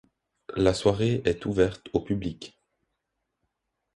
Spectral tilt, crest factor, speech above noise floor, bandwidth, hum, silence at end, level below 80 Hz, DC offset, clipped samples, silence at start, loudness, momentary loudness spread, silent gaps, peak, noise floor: -6.5 dB/octave; 20 dB; 56 dB; 11.5 kHz; none; 1.45 s; -48 dBFS; under 0.1%; under 0.1%; 0.5 s; -26 LUFS; 14 LU; none; -8 dBFS; -81 dBFS